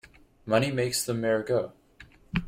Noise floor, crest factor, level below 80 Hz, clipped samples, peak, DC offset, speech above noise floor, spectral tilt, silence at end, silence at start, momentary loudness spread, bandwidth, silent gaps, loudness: -54 dBFS; 18 dB; -52 dBFS; under 0.1%; -10 dBFS; under 0.1%; 27 dB; -4.5 dB/octave; 0 s; 0.45 s; 11 LU; 16.5 kHz; none; -27 LUFS